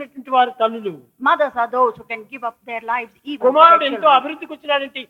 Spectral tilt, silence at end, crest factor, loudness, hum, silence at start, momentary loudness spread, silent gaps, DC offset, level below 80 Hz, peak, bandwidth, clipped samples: -5 dB/octave; 0.05 s; 18 dB; -16 LUFS; none; 0 s; 18 LU; none; under 0.1%; -70 dBFS; 0 dBFS; 6.8 kHz; under 0.1%